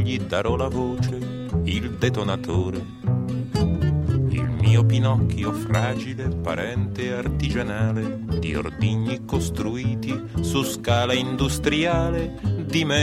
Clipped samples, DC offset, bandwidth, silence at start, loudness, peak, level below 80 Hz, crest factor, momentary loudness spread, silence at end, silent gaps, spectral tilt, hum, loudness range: under 0.1%; under 0.1%; 14.5 kHz; 0 s; -24 LUFS; -4 dBFS; -36 dBFS; 18 dB; 6 LU; 0 s; none; -6 dB/octave; none; 3 LU